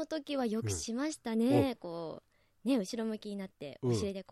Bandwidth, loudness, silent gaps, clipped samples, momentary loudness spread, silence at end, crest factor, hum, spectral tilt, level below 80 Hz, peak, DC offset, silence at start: 14 kHz; -35 LUFS; none; under 0.1%; 13 LU; 0.1 s; 18 dB; none; -5.5 dB/octave; -66 dBFS; -16 dBFS; under 0.1%; 0 s